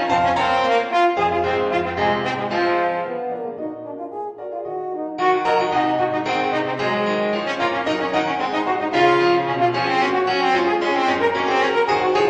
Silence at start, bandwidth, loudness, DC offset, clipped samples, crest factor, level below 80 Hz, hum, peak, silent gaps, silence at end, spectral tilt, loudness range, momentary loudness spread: 0 s; 8.6 kHz; -20 LUFS; under 0.1%; under 0.1%; 16 dB; -56 dBFS; none; -4 dBFS; none; 0 s; -5 dB/octave; 5 LU; 10 LU